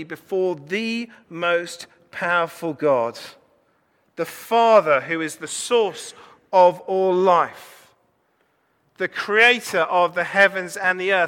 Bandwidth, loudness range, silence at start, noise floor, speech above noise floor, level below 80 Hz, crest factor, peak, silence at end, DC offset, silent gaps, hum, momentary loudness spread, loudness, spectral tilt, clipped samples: 18.5 kHz; 5 LU; 0 s; -65 dBFS; 45 dB; -74 dBFS; 18 dB; -4 dBFS; 0 s; under 0.1%; none; none; 15 LU; -20 LUFS; -3.5 dB/octave; under 0.1%